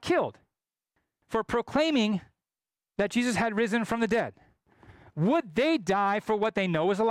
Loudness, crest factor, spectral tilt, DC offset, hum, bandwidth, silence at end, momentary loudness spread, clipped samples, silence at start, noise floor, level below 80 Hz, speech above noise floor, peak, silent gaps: -28 LUFS; 12 dB; -5.5 dB/octave; under 0.1%; none; 14.5 kHz; 0 s; 8 LU; under 0.1%; 0 s; under -90 dBFS; -60 dBFS; over 63 dB; -16 dBFS; none